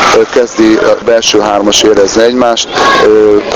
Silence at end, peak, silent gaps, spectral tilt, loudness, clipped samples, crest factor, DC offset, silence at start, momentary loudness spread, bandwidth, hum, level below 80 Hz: 0 s; 0 dBFS; none; -2.5 dB/octave; -7 LUFS; 2%; 6 dB; under 0.1%; 0 s; 3 LU; 17 kHz; none; -38 dBFS